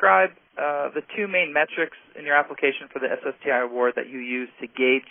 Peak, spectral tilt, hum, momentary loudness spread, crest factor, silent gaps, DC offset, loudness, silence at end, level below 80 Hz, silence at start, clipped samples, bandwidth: -4 dBFS; 3 dB/octave; none; 9 LU; 20 dB; none; under 0.1%; -24 LUFS; 0.1 s; -76 dBFS; 0 s; under 0.1%; 3.7 kHz